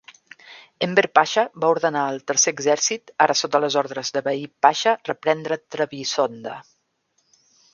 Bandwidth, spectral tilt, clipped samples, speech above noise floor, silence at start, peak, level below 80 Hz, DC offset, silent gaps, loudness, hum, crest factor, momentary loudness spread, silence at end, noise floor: 10.5 kHz; -2 dB/octave; under 0.1%; 48 dB; 0.45 s; 0 dBFS; -74 dBFS; under 0.1%; none; -21 LUFS; none; 22 dB; 9 LU; 1.1 s; -69 dBFS